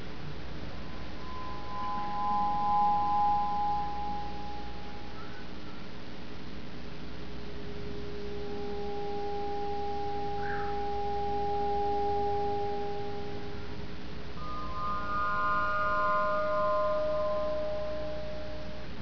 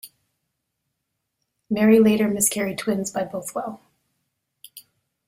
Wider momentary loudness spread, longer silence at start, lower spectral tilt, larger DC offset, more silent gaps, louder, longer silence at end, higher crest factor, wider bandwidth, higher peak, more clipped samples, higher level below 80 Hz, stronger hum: about the same, 15 LU vs 15 LU; about the same, 0 s vs 0.05 s; first, -6.5 dB/octave vs -4.5 dB/octave; first, 2% vs under 0.1%; neither; second, -33 LUFS vs -21 LUFS; second, 0 s vs 0.5 s; second, 14 dB vs 20 dB; second, 5.4 kHz vs 16 kHz; second, -18 dBFS vs -6 dBFS; neither; first, -48 dBFS vs -62 dBFS; neither